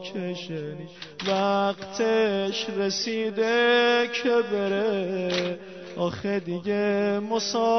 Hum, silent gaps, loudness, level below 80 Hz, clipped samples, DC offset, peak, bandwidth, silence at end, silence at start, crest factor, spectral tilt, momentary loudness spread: none; none; -25 LUFS; -66 dBFS; under 0.1%; 0.1%; -12 dBFS; 6.4 kHz; 0 s; 0 s; 14 dB; -4.5 dB/octave; 11 LU